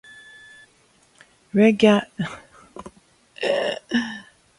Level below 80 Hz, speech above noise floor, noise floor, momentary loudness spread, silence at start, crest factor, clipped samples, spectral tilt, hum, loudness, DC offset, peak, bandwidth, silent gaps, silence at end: -62 dBFS; 39 dB; -59 dBFS; 26 LU; 1.55 s; 22 dB; under 0.1%; -6 dB/octave; none; -21 LUFS; under 0.1%; -2 dBFS; 11.5 kHz; none; 0.35 s